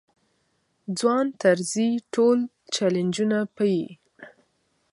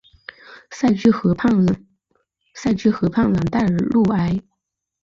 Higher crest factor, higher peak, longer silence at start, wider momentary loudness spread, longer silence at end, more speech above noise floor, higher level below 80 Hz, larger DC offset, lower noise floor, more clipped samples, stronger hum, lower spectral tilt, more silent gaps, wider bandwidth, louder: about the same, 20 dB vs 16 dB; about the same, -6 dBFS vs -4 dBFS; first, 0.9 s vs 0.5 s; second, 8 LU vs 11 LU; about the same, 0.65 s vs 0.65 s; second, 48 dB vs 60 dB; second, -74 dBFS vs -46 dBFS; neither; second, -70 dBFS vs -77 dBFS; neither; neither; second, -5 dB/octave vs -7.5 dB/octave; neither; first, 11.5 kHz vs 7.4 kHz; second, -24 LUFS vs -19 LUFS